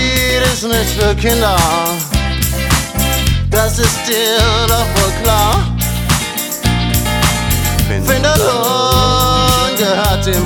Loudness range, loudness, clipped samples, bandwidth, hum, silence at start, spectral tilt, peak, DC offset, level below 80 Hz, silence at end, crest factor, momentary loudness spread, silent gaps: 2 LU; -13 LUFS; under 0.1%; over 20 kHz; none; 0 s; -4 dB/octave; 0 dBFS; under 0.1%; -20 dBFS; 0 s; 12 dB; 4 LU; none